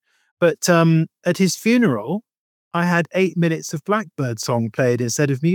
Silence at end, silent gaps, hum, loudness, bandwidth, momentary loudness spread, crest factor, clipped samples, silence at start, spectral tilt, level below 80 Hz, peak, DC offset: 0 s; 2.37-2.71 s; none; -19 LUFS; 19 kHz; 9 LU; 16 dB; under 0.1%; 0.4 s; -5.5 dB/octave; -74 dBFS; -2 dBFS; under 0.1%